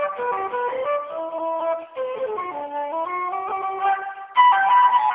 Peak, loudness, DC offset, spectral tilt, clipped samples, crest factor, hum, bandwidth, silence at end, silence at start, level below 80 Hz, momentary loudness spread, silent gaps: -6 dBFS; -22 LUFS; under 0.1%; -6 dB/octave; under 0.1%; 16 dB; none; 3.9 kHz; 0 s; 0 s; -70 dBFS; 12 LU; none